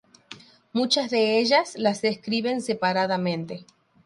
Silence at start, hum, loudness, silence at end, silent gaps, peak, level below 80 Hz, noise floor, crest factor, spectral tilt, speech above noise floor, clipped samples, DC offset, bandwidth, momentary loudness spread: 0.3 s; none; -24 LUFS; 0.45 s; none; -8 dBFS; -70 dBFS; -48 dBFS; 18 dB; -4.5 dB/octave; 24 dB; under 0.1%; under 0.1%; 11.5 kHz; 18 LU